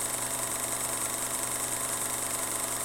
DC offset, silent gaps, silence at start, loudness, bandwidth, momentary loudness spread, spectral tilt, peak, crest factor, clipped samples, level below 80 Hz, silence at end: under 0.1%; none; 0 s; -29 LUFS; 17 kHz; 0 LU; -1 dB/octave; -14 dBFS; 18 dB; under 0.1%; -58 dBFS; 0 s